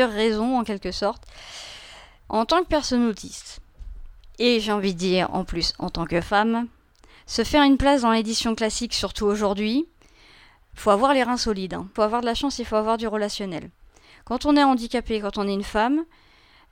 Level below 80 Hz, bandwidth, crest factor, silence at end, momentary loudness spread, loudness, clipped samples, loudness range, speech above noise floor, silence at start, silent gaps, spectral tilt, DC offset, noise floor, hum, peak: -42 dBFS; 16.5 kHz; 18 dB; 0.7 s; 17 LU; -23 LUFS; under 0.1%; 4 LU; 31 dB; 0 s; none; -4.5 dB/octave; under 0.1%; -53 dBFS; none; -6 dBFS